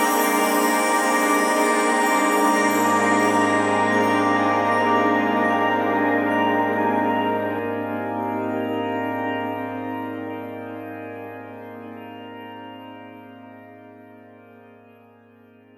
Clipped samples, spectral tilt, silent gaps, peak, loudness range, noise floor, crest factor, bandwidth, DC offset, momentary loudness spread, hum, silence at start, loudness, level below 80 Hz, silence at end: under 0.1%; -4 dB/octave; none; -6 dBFS; 20 LU; -51 dBFS; 16 dB; over 20 kHz; under 0.1%; 19 LU; none; 0 s; -20 LUFS; -70 dBFS; 1.45 s